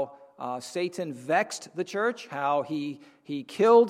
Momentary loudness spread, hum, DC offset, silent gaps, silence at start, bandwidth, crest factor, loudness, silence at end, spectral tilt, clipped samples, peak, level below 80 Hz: 11 LU; none; under 0.1%; none; 0 s; 13 kHz; 20 dB; -29 LUFS; 0 s; -4.5 dB/octave; under 0.1%; -8 dBFS; -82 dBFS